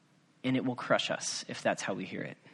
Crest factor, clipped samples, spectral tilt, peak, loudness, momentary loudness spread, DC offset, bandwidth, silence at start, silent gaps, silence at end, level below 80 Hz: 22 dB; under 0.1%; -3.5 dB/octave; -14 dBFS; -33 LUFS; 8 LU; under 0.1%; 11.5 kHz; 0.45 s; none; 0.05 s; -76 dBFS